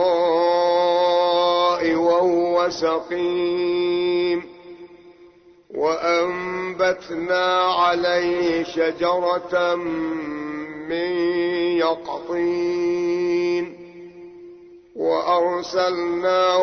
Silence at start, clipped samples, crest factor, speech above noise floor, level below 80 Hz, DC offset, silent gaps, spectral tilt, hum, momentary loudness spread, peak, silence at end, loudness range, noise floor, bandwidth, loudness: 0 s; under 0.1%; 14 dB; 29 dB; -60 dBFS; under 0.1%; none; -5 dB/octave; none; 10 LU; -8 dBFS; 0 s; 5 LU; -50 dBFS; 6.6 kHz; -21 LUFS